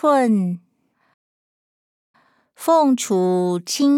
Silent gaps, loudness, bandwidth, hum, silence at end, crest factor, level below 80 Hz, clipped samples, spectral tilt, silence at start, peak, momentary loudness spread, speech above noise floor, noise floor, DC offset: 1.14-2.14 s; -19 LUFS; 17 kHz; none; 0 s; 14 dB; -78 dBFS; under 0.1%; -5.5 dB/octave; 0.05 s; -6 dBFS; 10 LU; over 73 dB; under -90 dBFS; under 0.1%